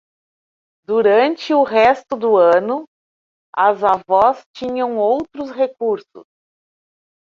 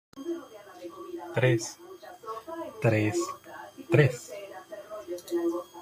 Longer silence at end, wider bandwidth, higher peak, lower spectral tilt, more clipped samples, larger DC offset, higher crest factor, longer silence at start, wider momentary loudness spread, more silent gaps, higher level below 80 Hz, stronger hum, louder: first, 1 s vs 0 s; second, 7.2 kHz vs 15 kHz; first, -2 dBFS vs -8 dBFS; about the same, -5.5 dB/octave vs -6 dB/octave; neither; neither; second, 16 dB vs 24 dB; first, 0.9 s vs 0.15 s; second, 12 LU vs 20 LU; first, 2.87-3.53 s, 4.46-4.54 s vs none; first, -58 dBFS vs -68 dBFS; neither; first, -16 LUFS vs -29 LUFS